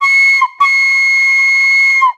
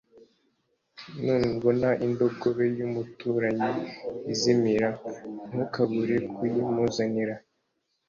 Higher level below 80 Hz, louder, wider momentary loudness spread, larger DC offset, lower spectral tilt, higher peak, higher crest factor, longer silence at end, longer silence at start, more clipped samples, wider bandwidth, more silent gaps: second, -78 dBFS vs -60 dBFS; first, -8 LUFS vs -27 LUFS; second, 2 LU vs 12 LU; neither; second, 5 dB/octave vs -6 dB/octave; first, 0 dBFS vs -10 dBFS; second, 10 dB vs 18 dB; second, 0.05 s vs 0.7 s; second, 0 s vs 1 s; neither; first, 13.5 kHz vs 7.4 kHz; neither